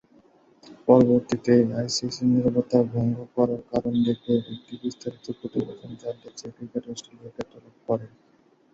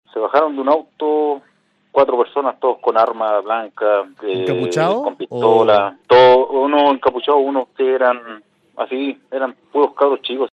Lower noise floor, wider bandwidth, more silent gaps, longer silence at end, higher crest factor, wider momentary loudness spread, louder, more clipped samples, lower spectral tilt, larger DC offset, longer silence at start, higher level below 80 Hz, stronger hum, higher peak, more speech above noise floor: about the same, -57 dBFS vs -59 dBFS; about the same, 7.8 kHz vs 8.4 kHz; neither; first, 0.65 s vs 0.05 s; first, 22 dB vs 16 dB; first, 18 LU vs 11 LU; second, -24 LUFS vs -16 LUFS; neither; about the same, -6.5 dB/octave vs -6 dB/octave; neither; first, 0.65 s vs 0.15 s; about the same, -58 dBFS vs -62 dBFS; neither; about the same, -2 dBFS vs 0 dBFS; second, 33 dB vs 43 dB